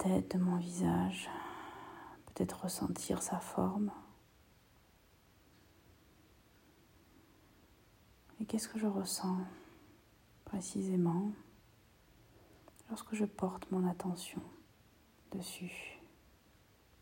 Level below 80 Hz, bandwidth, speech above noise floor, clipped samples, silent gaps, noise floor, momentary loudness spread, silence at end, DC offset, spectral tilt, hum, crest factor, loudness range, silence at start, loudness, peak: -68 dBFS; 16 kHz; 30 dB; under 0.1%; none; -67 dBFS; 18 LU; 0.95 s; under 0.1%; -5.5 dB/octave; none; 22 dB; 6 LU; 0 s; -39 LUFS; -18 dBFS